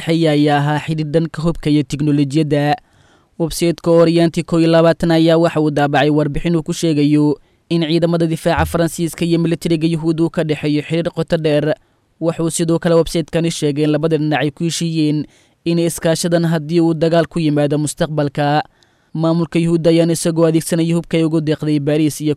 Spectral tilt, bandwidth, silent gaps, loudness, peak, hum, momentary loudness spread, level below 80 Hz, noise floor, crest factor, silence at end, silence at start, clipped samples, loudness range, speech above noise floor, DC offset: -6 dB/octave; 14.5 kHz; none; -16 LUFS; -4 dBFS; none; 6 LU; -40 dBFS; -52 dBFS; 12 dB; 0 s; 0 s; under 0.1%; 3 LU; 37 dB; under 0.1%